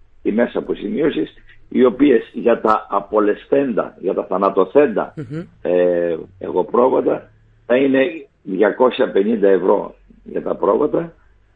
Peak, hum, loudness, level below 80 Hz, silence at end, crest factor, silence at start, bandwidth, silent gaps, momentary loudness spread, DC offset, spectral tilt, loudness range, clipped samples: 0 dBFS; none; -17 LUFS; -52 dBFS; 0.45 s; 18 dB; 0.25 s; 4.7 kHz; none; 12 LU; under 0.1%; -9 dB/octave; 2 LU; under 0.1%